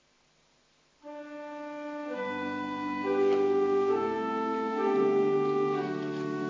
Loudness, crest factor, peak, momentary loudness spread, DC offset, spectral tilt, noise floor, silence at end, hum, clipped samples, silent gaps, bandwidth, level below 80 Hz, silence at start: -29 LUFS; 14 dB; -16 dBFS; 15 LU; under 0.1%; -7 dB/octave; -67 dBFS; 0 s; none; under 0.1%; none; 7.4 kHz; -72 dBFS; 1.05 s